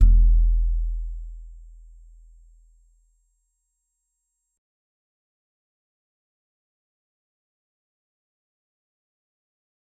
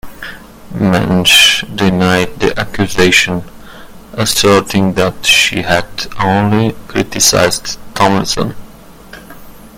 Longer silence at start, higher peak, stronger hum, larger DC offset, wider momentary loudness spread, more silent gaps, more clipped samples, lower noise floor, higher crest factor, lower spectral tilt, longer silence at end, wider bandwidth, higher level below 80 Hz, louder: about the same, 0 s vs 0.05 s; second, -4 dBFS vs 0 dBFS; neither; neither; first, 25 LU vs 14 LU; neither; second, under 0.1% vs 0.2%; first, -78 dBFS vs -35 dBFS; first, 22 dB vs 12 dB; first, -9.5 dB/octave vs -3.5 dB/octave; first, 8.45 s vs 0 s; second, 0.3 kHz vs over 20 kHz; first, -26 dBFS vs -36 dBFS; second, -24 LUFS vs -11 LUFS